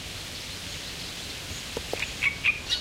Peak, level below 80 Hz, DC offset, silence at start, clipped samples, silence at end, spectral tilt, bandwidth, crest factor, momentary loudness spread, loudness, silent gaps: -12 dBFS; -48 dBFS; under 0.1%; 0 s; under 0.1%; 0 s; -1.5 dB/octave; 16 kHz; 20 dB; 11 LU; -30 LUFS; none